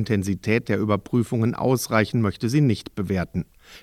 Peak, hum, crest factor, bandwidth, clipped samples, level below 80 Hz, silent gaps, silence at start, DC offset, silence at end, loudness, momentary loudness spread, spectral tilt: -4 dBFS; none; 18 dB; 15.5 kHz; under 0.1%; -52 dBFS; none; 0 s; under 0.1%; 0.05 s; -23 LUFS; 7 LU; -6.5 dB/octave